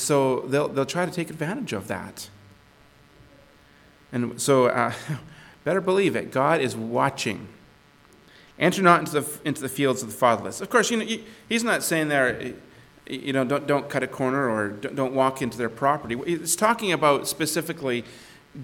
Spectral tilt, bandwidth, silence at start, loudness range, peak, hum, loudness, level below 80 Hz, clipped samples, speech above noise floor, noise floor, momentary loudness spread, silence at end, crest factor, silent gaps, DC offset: -4.5 dB/octave; 19 kHz; 0 s; 5 LU; -2 dBFS; none; -24 LUFS; -62 dBFS; under 0.1%; 30 dB; -54 dBFS; 12 LU; 0 s; 22 dB; none; under 0.1%